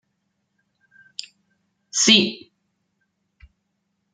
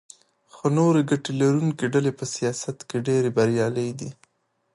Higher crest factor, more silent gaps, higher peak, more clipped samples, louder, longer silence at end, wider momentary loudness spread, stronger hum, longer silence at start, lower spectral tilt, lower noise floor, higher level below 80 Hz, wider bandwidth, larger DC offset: first, 26 dB vs 16 dB; neither; first, 0 dBFS vs -8 dBFS; neither; first, -16 LUFS vs -23 LUFS; first, 1.75 s vs 0.6 s; first, 23 LU vs 10 LU; neither; first, 1.95 s vs 0.55 s; second, -1.5 dB/octave vs -6 dB/octave; about the same, -74 dBFS vs -71 dBFS; about the same, -64 dBFS vs -66 dBFS; second, 10 kHz vs 11.5 kHz; neither